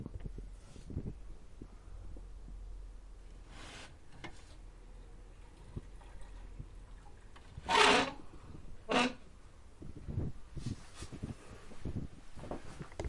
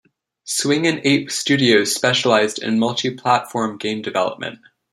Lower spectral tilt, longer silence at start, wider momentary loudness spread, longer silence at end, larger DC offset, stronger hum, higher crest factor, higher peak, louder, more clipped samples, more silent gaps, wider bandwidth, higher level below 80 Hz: about the same, -3.5 dB/octave vs -3.5 dB/octave; second, 0 s vs 0.45 s; first, 24 LU vs 9 LU; second, 0 s vs 0.35 s; neither; neither; first, 30 dB vs 18 dB; second, -10 dBFS vs -2 dBFS; second, -35 LUFS vs -18 LUFS; neither; neither; second, 11.5 kHz vs 15.5 kHz; first, -50 dBFS vs -64 dBFS